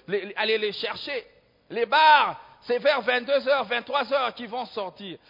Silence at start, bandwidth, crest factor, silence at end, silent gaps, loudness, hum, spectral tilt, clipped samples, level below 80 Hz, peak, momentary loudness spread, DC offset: 0.1 s; 5.4 kHz; 18 dB; 0.15 s; none; -24 LUFS; none; -4.5 dB/octave; under 0.1%; -72 dBFS; -6 dBFS; 16 LU; under 0.1%